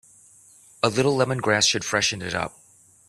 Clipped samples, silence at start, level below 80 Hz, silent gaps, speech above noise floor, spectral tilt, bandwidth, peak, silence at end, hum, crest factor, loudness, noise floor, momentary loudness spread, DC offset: under 0.1%; 0.85 s; -58 dBFS; none; 30 dB; -3 dB/octave; 14.5 kHz; -4 dBFS; 0.6 s; none; 22 dB; -22 LUFS; -53 dBFS; 9 LU; under 0.1%